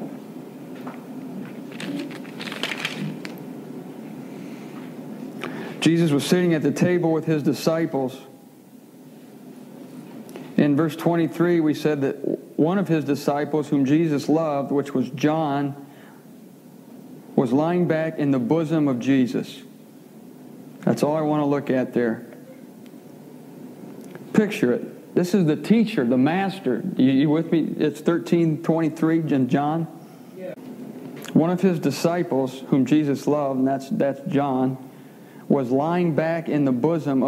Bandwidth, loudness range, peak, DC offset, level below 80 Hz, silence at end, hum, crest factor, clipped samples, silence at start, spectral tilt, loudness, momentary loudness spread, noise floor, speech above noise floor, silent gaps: 16 kHz; 7 LU; -4 dBFS; under 0.1%; -78 dBFS; 0 s; none; 20 dB; under 0.1%; 0 s; -7 dB/octave; -22 LUFS; 20 LU; -47 dBFS; 26 dB; none